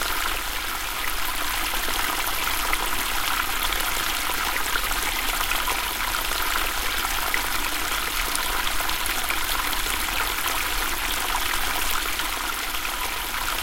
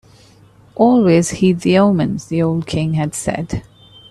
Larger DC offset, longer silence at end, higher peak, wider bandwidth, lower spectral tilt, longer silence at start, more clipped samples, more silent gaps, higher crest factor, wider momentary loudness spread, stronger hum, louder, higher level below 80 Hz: neither; second, 0 s vs 0.5 s; about the same, -2 dBFS vs 0 dBFS; first, 17 kHz vs 13 kHz; second, -0.5 dB/octave vs -6.5 dB/octave; second, 0 s vs 0.8 s; neither; neither; first, 22 dB vs 16 dB; second, 3 LU vs 11 LU; neither; second, -24 LUFS vs -16 LUFS; first, -34 dBFS vs -44 dBFS